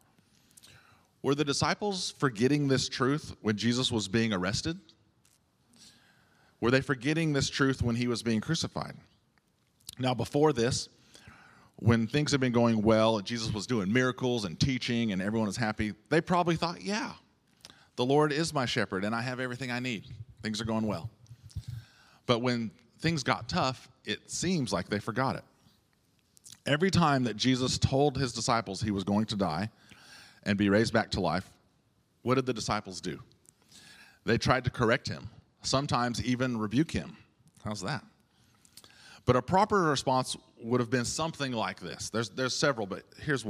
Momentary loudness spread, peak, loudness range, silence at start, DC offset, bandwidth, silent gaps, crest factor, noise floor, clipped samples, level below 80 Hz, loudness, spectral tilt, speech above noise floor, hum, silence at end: 13 LU; -8 dBFS; 5 LU; 1.25 s; under 0.1%; 14.5 kHz; none; 24 dB; -70 dBFS; under 0.1%; -58 dBFS; -30 LUFS; -5 dB/octave; 41 dB; none; 0 s